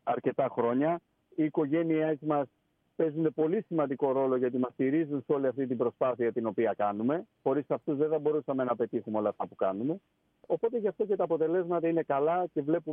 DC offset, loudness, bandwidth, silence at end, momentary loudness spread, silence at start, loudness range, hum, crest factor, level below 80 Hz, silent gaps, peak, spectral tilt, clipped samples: under 0.1%; -30 LUFS; 3.7 kHz; 0 s; 4 LU; 0.05 s; 2 LU; none; 16 dB; -80 dBFS; none; -14 dBFS; -11 dB/octave; under 0.1%